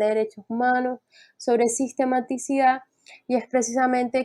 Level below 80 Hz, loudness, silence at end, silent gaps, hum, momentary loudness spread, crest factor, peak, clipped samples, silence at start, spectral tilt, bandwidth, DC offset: -74 dBFS; -24 LUFS; 0 s; none; none; 9 LU; 14 dB; -10 dBFS; under 0.1%; 0 s; -3.5 dB/octave; 12.5 kHz; under 0.1%